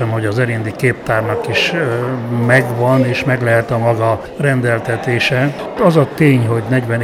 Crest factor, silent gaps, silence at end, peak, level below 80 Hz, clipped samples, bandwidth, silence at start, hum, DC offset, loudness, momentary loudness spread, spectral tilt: 14 dB; none; 0 s; 0 dBFS; -46 dBFS; under 0.1%; 14.5 kHz; 0 s; none; under 0.1%; -15 LUFS; 5 LU; -6.5 dB/octave